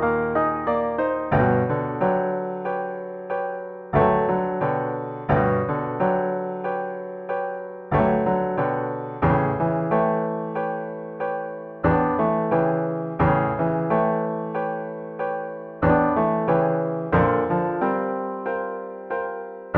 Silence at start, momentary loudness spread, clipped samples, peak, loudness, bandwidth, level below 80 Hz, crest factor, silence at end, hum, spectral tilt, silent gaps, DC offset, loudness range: 0 s; 10 LU; under 0.1%; -4 dBFS; -23 LUFS; 4.5 kHz; -46 dBFS; 18 dB; 0 s; none; -11 dB/octave; none; under 0.1%; 2 LU